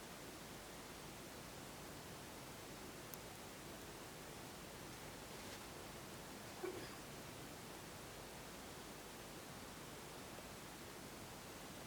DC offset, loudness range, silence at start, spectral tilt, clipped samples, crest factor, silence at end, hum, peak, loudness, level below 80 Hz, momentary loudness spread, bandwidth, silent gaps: under 0.1%; 1 LU; 0 s; -3.5 dB/octave; under 0.1%; 26 dB; 0 s; none; -28 dBFS; -53 LUFS; -68 dBFS; 2 LU; over 20 kHz; none